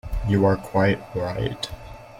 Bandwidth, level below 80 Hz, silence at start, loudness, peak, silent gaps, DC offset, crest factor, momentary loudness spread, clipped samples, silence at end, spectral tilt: 16 kHz; -36 dBFS; 0.05 s; -23 LUFS; -8 dBFS; none; under 0.1%; 16 dB; 12 LU; under 0.1%; 0 s; -7 dB/octave